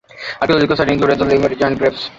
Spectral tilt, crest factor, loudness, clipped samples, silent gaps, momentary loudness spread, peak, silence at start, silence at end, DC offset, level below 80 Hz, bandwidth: -6.5 dB/octave; 14 dB; -15 LUFS; under 0.1%; none; 5 LU; 0 dBFS; 0.15 s; 0.1 s; under 0.1%; -42 dBFS; 7.8 kHz